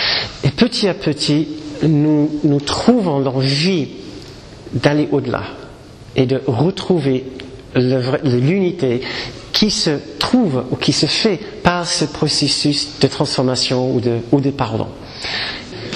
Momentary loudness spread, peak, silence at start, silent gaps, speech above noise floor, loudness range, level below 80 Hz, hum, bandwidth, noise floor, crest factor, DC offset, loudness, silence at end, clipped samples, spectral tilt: 11 LU; 0 dBFS; 0 s; none; 21 dB; 3 LU; -44 dBFS; none; 13 kHz; -37 dBFS; 16 dB; under 0.1%; -17 LUFS; 0 s; under 0.1%; -5 dB/octave